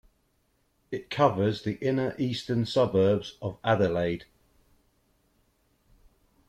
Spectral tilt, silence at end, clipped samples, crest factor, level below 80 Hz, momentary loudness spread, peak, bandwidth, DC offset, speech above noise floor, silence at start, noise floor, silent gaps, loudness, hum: -7 dB/octave; 2.25 s; under 0.1%; 22 dB; -60 dBFS; 12 LU; -8 dBFS; 13 kHz; under 0.1%; 44 dB; 0.9 s; -71 dBFS; none; -27 LUFS; none